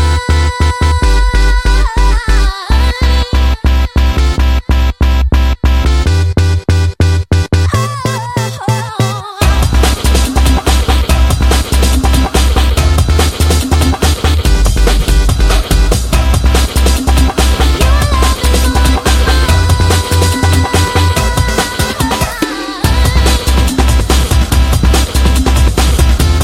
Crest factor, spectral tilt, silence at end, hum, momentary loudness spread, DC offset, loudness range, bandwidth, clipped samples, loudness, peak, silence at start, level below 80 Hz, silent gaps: 10 dB; -5 dB/octave; 0 s; none; 3 LU; under 0.1%; 2 LU; 16 kHz; under 0.1%; -11 LUFS; 0 dBFS; 0 s; -10 dBFS; none